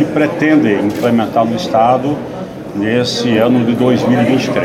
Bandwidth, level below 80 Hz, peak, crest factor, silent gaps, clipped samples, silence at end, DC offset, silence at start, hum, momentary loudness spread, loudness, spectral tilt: 14 kHz; -48 dBFS; 0 dBFS; 12 dB; none; under 0.1%; 0 s; under 0.1%; 0 s; none; 8 LU; -13 LUFS; -6 dB/octave